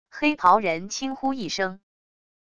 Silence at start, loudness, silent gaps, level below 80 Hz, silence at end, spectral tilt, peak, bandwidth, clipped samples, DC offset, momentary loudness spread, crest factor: 0.05 s; -24 LUFS; none; -60 dBFS; 0.7 s; -3.5 dB/octave; -4 dBFS; 10.5 kHz; under 0.1%; 0.5%; 10 LU; 20 dB